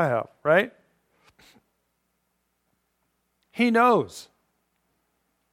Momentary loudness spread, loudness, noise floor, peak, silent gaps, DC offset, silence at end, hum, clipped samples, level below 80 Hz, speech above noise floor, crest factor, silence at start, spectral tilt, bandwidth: 19 LU; -22 LUFS; -75 dBFS; -6 dBFS; none; under 0.1%; 1.3 s; none; under 0.1%; -74 dBFS; 53 dB; 20 dB; 0 s; -6 dB/octave; 15 kHz